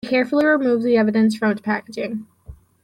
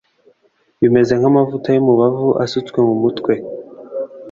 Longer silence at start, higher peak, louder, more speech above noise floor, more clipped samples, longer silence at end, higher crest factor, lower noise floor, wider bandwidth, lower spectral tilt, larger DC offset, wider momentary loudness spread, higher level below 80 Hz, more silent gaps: second, 0.05 s vs 0.8 s; second, -6 dBFS vs -2 dBFS; second, -19 LUFS vs -15 LUFS; second, 25 dB vs 46 dB; neither; first, 0.3 s vs 0 s; about the same, 12 dB vs 14 dB; second, -43 dBFS vs -60 dBFS; first, 11.5 kHz vs 7.4 kHz; second, -6.5 dB/octave vs -8 dB/octave; neither; second, 11 LU vs 14 LU; about the same, -54 dBFS vs -54 dBFS; neither